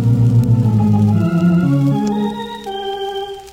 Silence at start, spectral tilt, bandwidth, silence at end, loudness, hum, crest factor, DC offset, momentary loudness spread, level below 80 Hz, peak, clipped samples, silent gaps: 0 s; -8.5 dB/octave; 9.4 kHz; 0 s; -15 LUFS; none; 12 dB; under 0.1%; 11 LU; -40 dBFS; -4 dBFS; under 0.1%; none